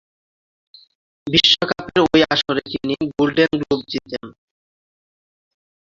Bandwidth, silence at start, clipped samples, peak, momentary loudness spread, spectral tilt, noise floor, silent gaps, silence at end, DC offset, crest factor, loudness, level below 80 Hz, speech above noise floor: 7.6 kHz; 1.25 s; under 0.1%; 0 dBFS; 13 LU; -4.5 dB/octave; under -90 dBFS; none; 1.65 s; under 0.1%; 20 dB; -17 LUFS; -52 dBFS; over 72 dB